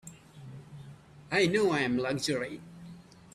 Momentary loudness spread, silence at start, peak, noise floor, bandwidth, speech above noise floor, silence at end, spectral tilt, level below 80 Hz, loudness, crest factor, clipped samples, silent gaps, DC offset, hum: 24 LU; 0.05 s; -14 dBFS; -51 dBFS; 14 kHz; 22 dB; 0.35 s; -4.5 dB/octave; -66 dBFS; -29 LUFS; 18 dB; under 0.1%; none; under 0.1%; none